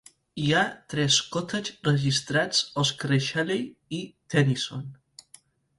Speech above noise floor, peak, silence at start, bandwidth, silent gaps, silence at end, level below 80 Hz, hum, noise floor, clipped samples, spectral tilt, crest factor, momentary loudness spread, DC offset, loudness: 31 dB; -8 dBFS; 0.35 s; 11.5 kHz; none; 0.85 s; -62 dBFS; none; -57 dBFS; under 0.1%; -4 dB/octave; 20 dB; 13 LU; under 0.1%; -26 LUFS